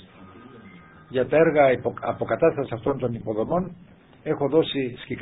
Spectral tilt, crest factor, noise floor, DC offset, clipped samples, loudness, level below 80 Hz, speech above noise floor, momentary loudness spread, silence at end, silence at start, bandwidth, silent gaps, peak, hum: -11 dB/octave; 18 dB; -47 dBFS; under 0.1%; under 0.1%; -23 LUFS; -54 dBFS; 24 dB; 11 LU; 0 s; 0.2 s; 4 kHz; none; -6 dBFS; none